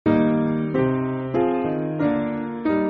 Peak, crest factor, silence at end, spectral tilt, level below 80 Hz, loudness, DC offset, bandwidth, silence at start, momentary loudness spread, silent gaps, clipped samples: -6 dBFS; 14 dB; 0 s; -7.5 dB/octave; -52 dBFS; -22 LUFS; under 0.1%; 4.8 kHz; 0.05 s; 5 LU; none; under 0.1%